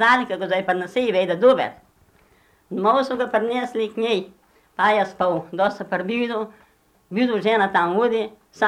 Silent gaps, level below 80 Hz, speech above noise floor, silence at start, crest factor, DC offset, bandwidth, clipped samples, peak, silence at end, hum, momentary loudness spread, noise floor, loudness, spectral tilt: none; -64 dBFS; 37 dB; 0 s; 16 dB; under 0.1%; 11.5 kHz; under 0.1%; -6 dBFS; 0 s; none; 11 LU; -58 dBFS; -21 LUFS; -5.5 dB/octave